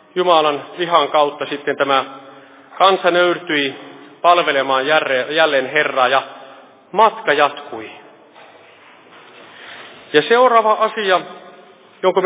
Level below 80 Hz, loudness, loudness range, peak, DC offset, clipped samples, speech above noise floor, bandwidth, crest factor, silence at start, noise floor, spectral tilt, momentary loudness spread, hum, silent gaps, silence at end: -74 dBFS; -15 LUFS; 5 LU; 0 dBFS; under 0.1%; under 0.1%; 29 dB; 4 kHz; 18 dB; 0.15 s; -45 dBFS; -7.5 dB/octave; 18 LU; none; none; 0 s